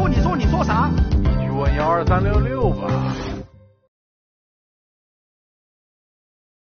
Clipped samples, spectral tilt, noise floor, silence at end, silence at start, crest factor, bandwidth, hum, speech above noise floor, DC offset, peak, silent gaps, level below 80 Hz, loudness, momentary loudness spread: under 0.1%; -7 dB/octave; -39 dBFS; 3.15 s; 0 s; 16 dB; 6.8 kHz; none; 21 dB; under 0.1%; -4 dBFS; none; -26 dBFS; -19 LUFS; 6 LU